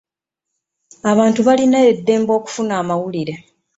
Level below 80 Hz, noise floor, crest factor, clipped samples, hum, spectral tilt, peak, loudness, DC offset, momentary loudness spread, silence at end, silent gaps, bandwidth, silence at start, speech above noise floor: -60 dBFS; -82 dBFS; 14 dB; under 0.1%; none; -5.5 dB/octave; -2 dBFS; -16 LUFS; under 0.1%; 11 LU; 0.4 s; none; 8 kHz; 1.05 s; 67 dB